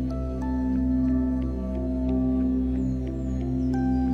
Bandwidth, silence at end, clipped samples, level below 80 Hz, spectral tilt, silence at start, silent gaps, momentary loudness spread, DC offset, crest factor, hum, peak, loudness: 6.4 kHz; 0 s; under 0.1%; -32 dBFS; -10 dB/octave; 0 s; none; 5 LU; under 0.1%; 10 dB; none; -16 dBFS; -26 LUFS